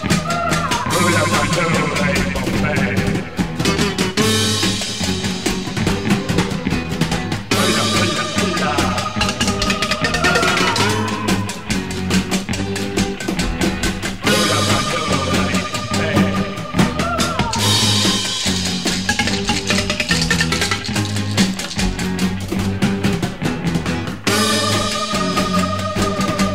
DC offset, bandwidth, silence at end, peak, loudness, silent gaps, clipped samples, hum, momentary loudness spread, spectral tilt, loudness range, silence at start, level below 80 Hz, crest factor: 1%; 16 kHz; 0 s; -2 dBFS; -18 LUFS; none; under 0.1%; none; 6 LU; -4 dB/octave; 3 LU; 0 s; -34 dBFS; 16 dB